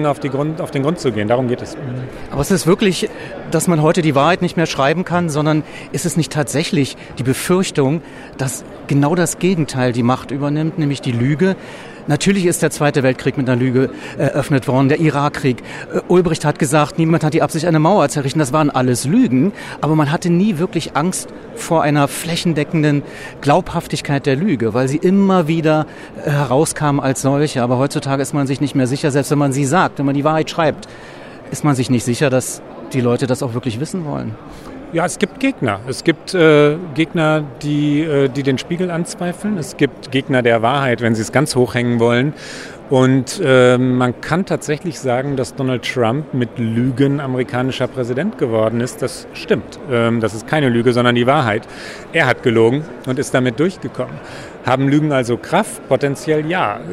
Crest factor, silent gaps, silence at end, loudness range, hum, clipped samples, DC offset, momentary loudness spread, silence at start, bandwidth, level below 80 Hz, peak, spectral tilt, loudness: 16 dB; none; 0 s; 3 LU; none; under 0.1%; under 0.1%; 9 LU; 0 s; 14.5 kHz; -46 dBFS; 0 dBFS; -6 dB/octave; -16 LUFS